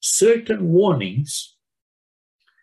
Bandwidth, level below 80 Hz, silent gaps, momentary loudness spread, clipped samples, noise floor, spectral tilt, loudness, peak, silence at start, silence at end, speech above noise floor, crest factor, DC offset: 13 kHz; -64 dBFS; none; 12 LU; under 0.1%; under -90 dBFS; -4.5 dB/octave; -19 LUFS; -6 dBFS; 0 s; 1.15 s; over 72 dB; 14 dB; under 0.1%